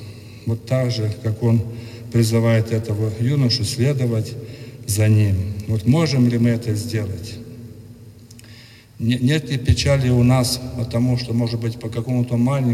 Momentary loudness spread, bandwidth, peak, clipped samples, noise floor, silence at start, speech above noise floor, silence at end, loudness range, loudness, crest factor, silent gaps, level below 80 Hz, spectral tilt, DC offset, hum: 15 LU; 15 kHz; -4 dBFS; under 0.1%; -43 dBFS; 0 s; 25 dB; 0 s; 4 LU; -20 LUFS; 16 dB; none; -44 dBFS; -6.5 dB/octave; under 0.1%; none